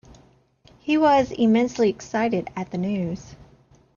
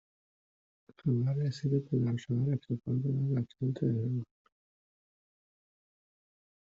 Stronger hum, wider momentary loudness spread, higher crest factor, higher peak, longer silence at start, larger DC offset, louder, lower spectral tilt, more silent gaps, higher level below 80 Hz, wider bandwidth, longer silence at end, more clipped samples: neither; first, 12 LU vs 5 LU; about the same, 16 dB vs 16 dB; first, -8 dBFS vs -18 dBFS; second, 0.85 s vs 1.05 s; neither; first, -22 LUFS vs -33 LUFS; second, -6.5 dB/octave vs -10 dB/octave; neither; first, -54 dBFS vs -70 dBFS; about the same, 7.2 kHz vs 7.4 kHz; second, 0.6 s vs 2.45 s; neither